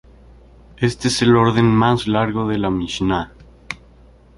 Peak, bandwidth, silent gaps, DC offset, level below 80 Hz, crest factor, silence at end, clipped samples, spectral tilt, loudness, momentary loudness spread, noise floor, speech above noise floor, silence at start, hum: -2 dBFS; 11.5 kHz; none; under 0.1%; -42 dBFS; 18 dB; 0.65 s; under 0.1%; -6 dB/octave; -17 LUFS; 19 LU; -47 dBFS; 30 dB; 0.8 s; none